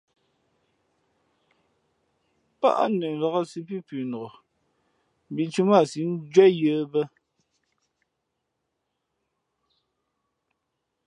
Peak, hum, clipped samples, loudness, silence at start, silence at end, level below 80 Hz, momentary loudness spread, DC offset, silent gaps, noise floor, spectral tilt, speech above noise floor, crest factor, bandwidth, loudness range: -4 dBFS; none; under 0.1%; -23 LUFS; 2.6 s; 4 s; -80 dBFS; 17 LU; under 0.1%; none; -80 dBFS; -6.5 dB/octave; 57 dB; 24 dB; 10 kHz; 7 LU